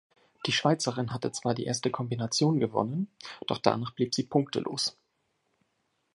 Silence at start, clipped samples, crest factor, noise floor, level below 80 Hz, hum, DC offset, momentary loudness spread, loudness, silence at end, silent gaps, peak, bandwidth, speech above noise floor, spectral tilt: 0.45 s; under 0.1%; 26 dB; -76 dBFS; -68 dBFS; none; under 0.1%; 7 LU; -29 LUFS; 1.25 s; none; -6 dBFS; 11.5 kHz; 47 dB; -4.5 dB/octave